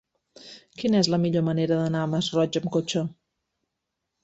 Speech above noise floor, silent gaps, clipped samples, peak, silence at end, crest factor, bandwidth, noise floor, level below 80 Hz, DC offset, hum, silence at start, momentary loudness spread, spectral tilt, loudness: 58 dB; none; under 0.1%; -8 dBFS; 1.1 s; 20 dB; 8.2 kHz; -82 dBFS; -64 dBFS; under 0.1%; none; 0.45 s; 15 LU; -6 dB/octave; -25 LUFS